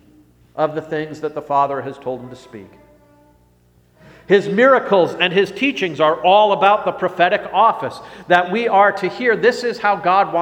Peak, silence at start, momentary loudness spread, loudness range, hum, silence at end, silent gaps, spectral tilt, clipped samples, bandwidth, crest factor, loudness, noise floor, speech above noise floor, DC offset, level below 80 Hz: 0 dBFS; 0.55 s; 14 LU; 9 LU; 60 Hz at -50 dBFS; 0 s; none; -5.5 dB/octave; under 0.1%; 15.5 kHz; 18 dB; -16 LUFS; -54 dBFS; 38 dB; under 0.1%; -60 dBFS